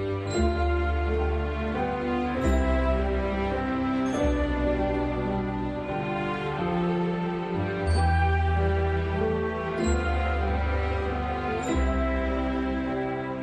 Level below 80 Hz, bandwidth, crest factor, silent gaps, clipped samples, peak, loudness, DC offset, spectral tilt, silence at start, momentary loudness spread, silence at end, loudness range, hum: -32 dBFS; 9.2 kHz; 14 dB; none; under 0.1%; -12 dBFS; -27 LUFS; under 0.1%; -7 dB/octave; 0 s; 5 LU; 0 s; 2 LU; none